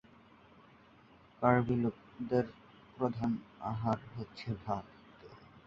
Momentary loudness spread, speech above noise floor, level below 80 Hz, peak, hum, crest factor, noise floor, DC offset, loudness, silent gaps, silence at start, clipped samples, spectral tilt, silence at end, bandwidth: 26 LU; 27 dB; -62 dBFS; -12 dBFS; none; 26 dB; -61 dBFS; under 0.1%; -35 LUFS; none; 1.4 s; under 0.1%; -9 dB/octave; 0.05 s; 7.2 kHz